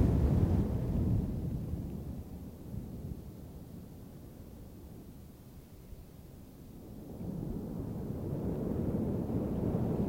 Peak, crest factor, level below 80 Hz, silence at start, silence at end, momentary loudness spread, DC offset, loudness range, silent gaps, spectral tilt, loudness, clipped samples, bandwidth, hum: -16 dBFS; 20 dB; -44 dBFS; 0 s; 0 s; 20 LU; under 0.1%; 15 LU; none; -9.5 dB/octave; -36 LUFS; under 0.1%; 16.5 kHz; none